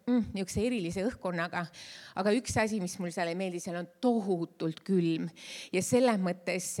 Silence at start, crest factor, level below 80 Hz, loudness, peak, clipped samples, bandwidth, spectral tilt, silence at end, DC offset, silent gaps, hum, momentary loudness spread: 0.05 s; 18 dB; -60 dBFS; -32 LUFS; -12 dBFS; under 0.1%; 16.5 kHz; -5 dB/octave; 0 s; under 0.1%; none; none; 9 LU